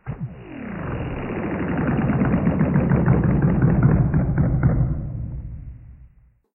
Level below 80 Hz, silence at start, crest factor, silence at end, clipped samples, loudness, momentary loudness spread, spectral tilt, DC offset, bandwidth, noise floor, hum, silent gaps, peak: -30 dBFS; 0.05 s; 16 dB; 0.5 s; under 0.1%; -21 LUFS; 16 LU; -14 dB/octave; under 0.1%; 3.1 kHz; -52 dBFS; none; none; -4 dBFS